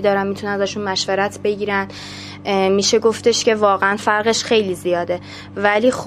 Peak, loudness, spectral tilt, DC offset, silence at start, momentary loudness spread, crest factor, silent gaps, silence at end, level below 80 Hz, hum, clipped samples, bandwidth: 0 dBFS; -18 LUFS; -3.5 dB/octave; under 0.1%; 0 s; 10 LU; 18 dB; none; 0 s; -52 dBFS; none; under 0.1%; 14.5 kHz